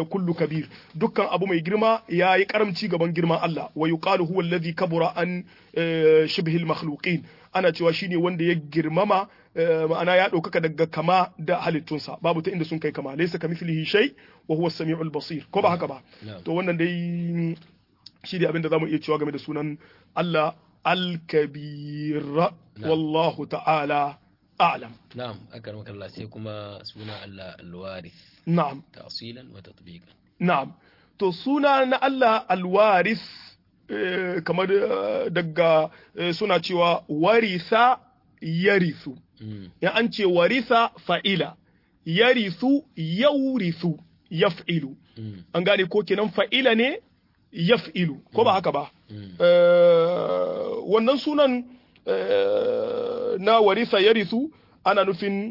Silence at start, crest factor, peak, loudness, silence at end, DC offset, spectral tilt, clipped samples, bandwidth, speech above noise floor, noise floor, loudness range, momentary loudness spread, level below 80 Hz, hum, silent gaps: 0 s; 18 dB; -6 dBFS; -23 LUFS; 0 s; under 0.1%; -7.5 dB/octave; under 0.1%; 5.8 kHz; 30 dB; -53 dBFS; 6 LU; 17 LU; -68 dBFS; none; none